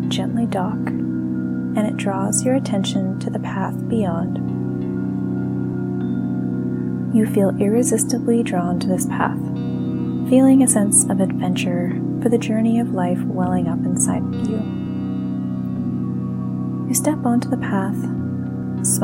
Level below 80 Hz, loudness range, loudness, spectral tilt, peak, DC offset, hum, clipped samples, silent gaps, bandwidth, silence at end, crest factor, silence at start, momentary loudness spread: -56 dBFS; 6 LU; -20 LUFS; -5.5 dB/octave; -2 dBFS; under 0.1%; none; under 0.1%; none; 16.5 kHz; 0 s; 18 dB; 0 s; 7 LU